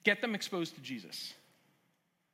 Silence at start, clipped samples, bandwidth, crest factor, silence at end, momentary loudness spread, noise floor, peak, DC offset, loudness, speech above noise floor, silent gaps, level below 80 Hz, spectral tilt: 0.05 s; under 0.1%; 16.5 kHz; 26 dB; 1 s; 13 LU; -77 dBFS; -14 dBFS; under 0.1%; -37 LUFS; 41 dB; none; under -90 dBFS; -3.5 dB/octave